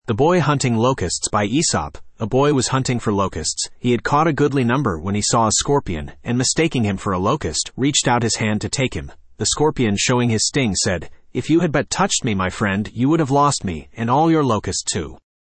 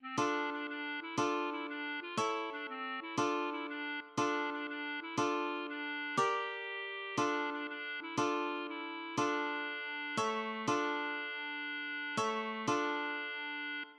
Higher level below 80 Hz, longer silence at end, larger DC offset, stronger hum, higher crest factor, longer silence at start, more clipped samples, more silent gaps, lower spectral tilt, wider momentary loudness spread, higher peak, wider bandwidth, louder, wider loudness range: first, -42 dBFS vs -86 dBFS; first, 0.25 s vs 0 s; neither; neither; about the same, 16 dB vs 18 dB; about the same, 0.05 s vs 0 s; neither; neither; about the same, -4.5 dB/octave vs -3.5 dB/octave; about the same, 8 LU vs 6 LU; first, -4 dBFS vs -20 dBFS; second, 8.8 kHz vs 12 kHz; first, -19 LUFS vs -37 LUFS; about the same, 1 LU vs 1 LU